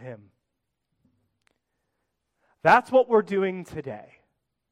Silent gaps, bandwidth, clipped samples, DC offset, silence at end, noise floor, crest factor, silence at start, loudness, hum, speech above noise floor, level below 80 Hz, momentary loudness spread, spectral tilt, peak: none; 12.5 kHz; under 0.1%; under 0.1%; 0.7 s; -81 dBFS; 22 dB; 0.05 s; -22 LUFS; none; 59 dB; -66 dBFS; 21 LU; -6.5 dB/octave; -6 dBFS